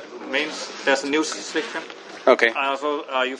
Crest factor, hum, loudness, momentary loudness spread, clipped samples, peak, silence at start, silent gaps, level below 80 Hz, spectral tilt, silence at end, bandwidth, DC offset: 22 dB; none; -22 LUFS; 11 LU; under 0.1%; 0 dBFS; 0 s; none; -78 dBFS; -1.5 dB/octave; 0 s; 11.5 kHz; under 0.1%